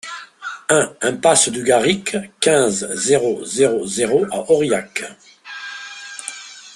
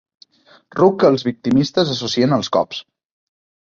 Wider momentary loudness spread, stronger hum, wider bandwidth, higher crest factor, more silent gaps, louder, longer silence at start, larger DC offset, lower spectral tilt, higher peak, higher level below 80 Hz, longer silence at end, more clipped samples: first, 17 LU vs 10 LU; neither; first, 12.5 kHz vs 7.6 kHz; about the same, 18 dB vs 18 dB; neither; about the same, -17 LUFS vs -17 LUFS; second, 0.05 s vs 0.75 s; neither; second, -3 dB/octave vs -6 dB/octave; about the same, 0 dBFS vs -2 dBFS; about the same, -58 dBFS vs -56 dBFS; second, 0 s vs 0.8 s; neither